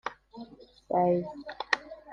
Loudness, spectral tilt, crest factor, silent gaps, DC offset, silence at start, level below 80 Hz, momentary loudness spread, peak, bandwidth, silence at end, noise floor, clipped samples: -30 LUFS; -5.5 dB/octave; 26 dB; none; under 0.1%; 0.05 s; -66 dBFS; 21 LU; -6 dBFS; 8.8 kHz; 0 s; -49 dBFS; under 0.1%